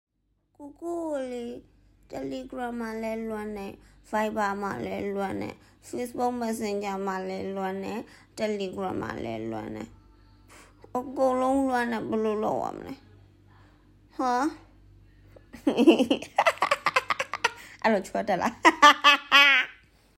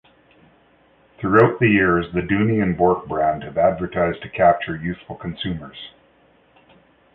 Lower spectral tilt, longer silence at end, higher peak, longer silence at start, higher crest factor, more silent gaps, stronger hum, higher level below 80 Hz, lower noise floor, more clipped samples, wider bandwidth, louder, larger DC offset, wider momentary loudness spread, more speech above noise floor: second, -3.5 dB/octave vs -10 dB/octave; second, 0.45 s vs 1.25 s; about the same, -4 dBFS vs -2 dBFS; second, 0.6 s vs 1.2 s; about the same, 24 dB vs 20 dB; neither; neither; second, -60 dBFS vs -46 dBFS; first, -72 dBFS vs -56 dBFS; neither; first, 16 kHz vs 4.5 kHz; second, -26 LUFS vs -19 LUFS; neither; first, 19 LU vs 15 LU; first, 45 dB vs 37 dB